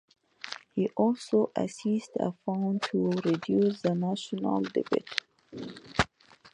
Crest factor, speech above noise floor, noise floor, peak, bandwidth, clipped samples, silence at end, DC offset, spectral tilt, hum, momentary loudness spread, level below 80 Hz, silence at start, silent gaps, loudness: 26 dB; 26 dB; -55 dBFS; -4 dBFS; 10.5 kHz; under 0.1%; 0.05 s; under 0.1%; -6 dB/octave; none; 14 LU; -58 dBFS; 0.45 s; none; -30 LUFS